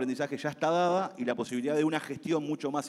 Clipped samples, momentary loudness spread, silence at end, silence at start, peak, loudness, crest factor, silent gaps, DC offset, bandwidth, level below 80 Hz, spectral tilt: under 0.1%; 6 LU; 0 s; 0 s; -12 dBFS; -30 LUFS; 18 dB; none; under 0.1%; 13 kHz; -80 dBFS; -5.5 dB/octave